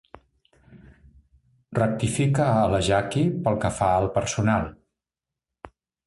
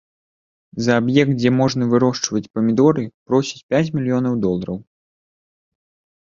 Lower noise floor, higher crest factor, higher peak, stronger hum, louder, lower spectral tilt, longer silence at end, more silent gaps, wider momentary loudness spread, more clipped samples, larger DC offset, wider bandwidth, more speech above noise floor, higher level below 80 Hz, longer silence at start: about the same, -89 dBFS vs under -90 dBFS; about the same, 18 dB vs 18 dB; second, -8 dBFS vs -2 dBFS; neither; second, -23 LUFS vs -18 LUFS; about the same, -6 dB/octave vs -6 dB/octave; second, 0.4 s vs 1.5 s; second, none vs 2.50-2.54 s, 3.14-3.26 s, 3.63-3.69 s; second, 5 LU vs 9 LU; neither; neither; first, 11.5 kHz vs 7.6 kHz; second, 66 dB vs over 72 dB; first, -46 dBFS vs -54 dBFS; about the same, 0.7 s vs 0.75 s